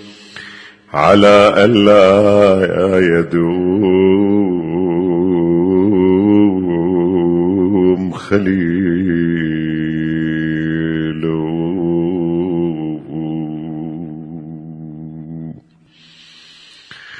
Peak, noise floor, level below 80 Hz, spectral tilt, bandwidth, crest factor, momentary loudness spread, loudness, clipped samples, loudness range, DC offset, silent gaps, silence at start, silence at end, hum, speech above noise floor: 0 dBFS; -48 dBFS; -46 dBFS; -7.5 dB/octave; 10 kHz; 14 dB; 21 LU; -13 LUFS; under 0.1%; 15 LU; under 0.1%; none; 0 s; 0 s; none; 38 dB